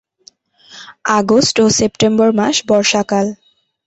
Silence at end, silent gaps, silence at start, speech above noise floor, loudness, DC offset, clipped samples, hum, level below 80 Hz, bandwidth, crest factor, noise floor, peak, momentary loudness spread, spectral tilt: 0.55 s; none; 0.75 s; 36 dB; -13 LUFS; under 0.1%; under 0.1%; none; -50 dBFS; 8.2 kHz; 14 dB; -49 dBFS; -2 dBFS; 6 LU; -3.5 dB/octave